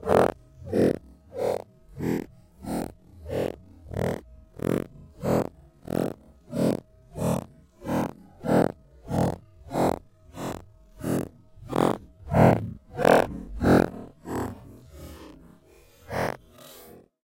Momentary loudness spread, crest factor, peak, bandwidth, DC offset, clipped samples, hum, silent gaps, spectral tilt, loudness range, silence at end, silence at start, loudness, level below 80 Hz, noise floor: 24 LU; 26 dB; -2 dBFS; 17 kHz; under 0.1%; under 0.1%; none; none; -7 dB/octave; 8 LU; 0.25 s; 0 s; -27 LUFS; -48 dBFS; -55 dBFS